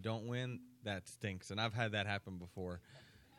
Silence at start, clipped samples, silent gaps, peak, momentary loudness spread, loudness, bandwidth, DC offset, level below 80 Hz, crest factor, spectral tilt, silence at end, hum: 0 s; under 0.1%; none; -22 dBFS; 13 LU; -42 LUFS; 14 kHz; under 0.1%; -72 dBFS; 22 dB; -5 dB/octave; 0 s; none